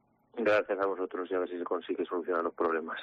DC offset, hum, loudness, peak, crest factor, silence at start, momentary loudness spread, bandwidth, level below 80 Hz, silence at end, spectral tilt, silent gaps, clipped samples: under 0.1%; none; -32 LUFS; -18 dBFS; 14 dB; 0.35 s; 7 LU; 7.4 kHz; -74 dBFS; 0 s; -2.5 dB/octave; none; under 0.1%